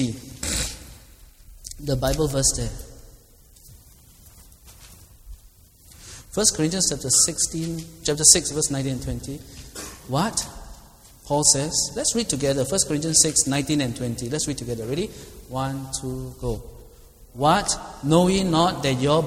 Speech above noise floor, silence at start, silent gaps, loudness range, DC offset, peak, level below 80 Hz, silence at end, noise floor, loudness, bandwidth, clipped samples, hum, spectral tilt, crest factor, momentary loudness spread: 29 dB; 0 s; none; 9 LU; under 0.1%; 0 dBFS; -42 dBFS; 0 s; -51 dBFS; -21 LUFS; 17 kHz; under 0.1%; none; -3 dB/octave; 24 dB; 18 LU